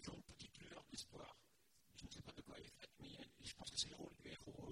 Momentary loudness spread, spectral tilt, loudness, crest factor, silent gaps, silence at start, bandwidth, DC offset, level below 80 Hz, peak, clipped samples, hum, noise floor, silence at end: 14 LU; -2.5 dB/octave; -54 LUFS; 28 dB; none; 0 s; 16 kHz; under 0.1%; -72 dBFS; -30 dBFS; under 0.1%; none; -77 dBFS; 0 s